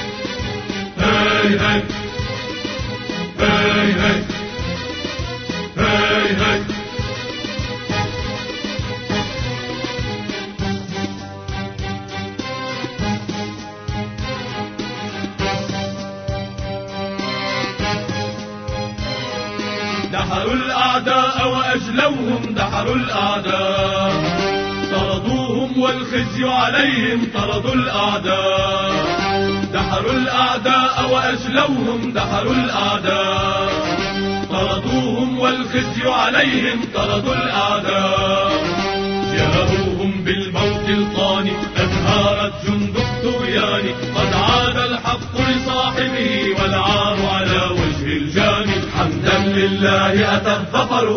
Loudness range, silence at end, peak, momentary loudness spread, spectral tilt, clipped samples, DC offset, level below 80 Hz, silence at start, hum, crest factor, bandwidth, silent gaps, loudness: 8 LU; 0 s; 0 dBFS; 10 LU; -5 dB/octave; under 0.1%; under 0.1%; -36 dBFS; 0 s; none; 18 dB; 6.6 kHz; none; -18 LUFS